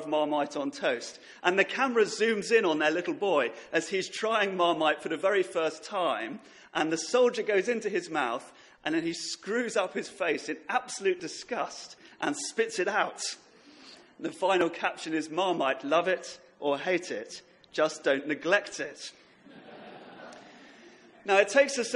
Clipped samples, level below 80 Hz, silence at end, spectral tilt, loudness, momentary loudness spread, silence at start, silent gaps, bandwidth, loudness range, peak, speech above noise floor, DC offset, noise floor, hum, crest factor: under 0.1%; -78 dBFS; 0 s; -3 dB/octave; -29 LUFS; 14 LU; 0 s; none; 11.5 kHz; 5 LU; -6 dBFS; 25 dB; under 0.1%; -54 dBFS; none; 22 dB